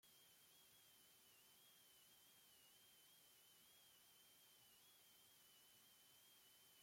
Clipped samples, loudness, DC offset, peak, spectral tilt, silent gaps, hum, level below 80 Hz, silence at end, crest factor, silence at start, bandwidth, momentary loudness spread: under 0.1%; -69 LUFS; under 0.1%; -58 dBFS; -0.5 dB/octave; none; none; under -90 dBFS; 0 s; 14 dB; 0 s; 16.5 kHz; 0 LU